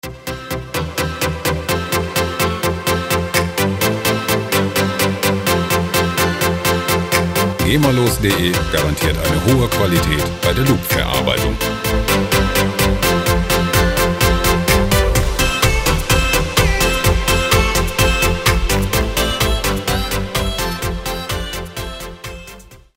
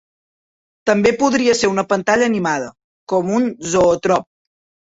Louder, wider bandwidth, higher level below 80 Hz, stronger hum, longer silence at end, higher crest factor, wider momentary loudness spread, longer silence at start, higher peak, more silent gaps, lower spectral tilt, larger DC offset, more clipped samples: about the same, -16 LUFS vs -17 LUFS; first, 16.5 kHz vs 8 kHz; first, -24 dBFS vs -52 dBFS; neither; second, 0.2 s vs 0.7 s; about the same, 16 dB vs 16 dB; about the same, 8 LU vs 7 LU; second, 0.05 s vs 0.85 s; about the same, 0 dBFS vs -2 dBFS; second, none vs 2.84-3.07 s; about the same, -4 dB/octave vs -4.5 dB/octave; neither; neither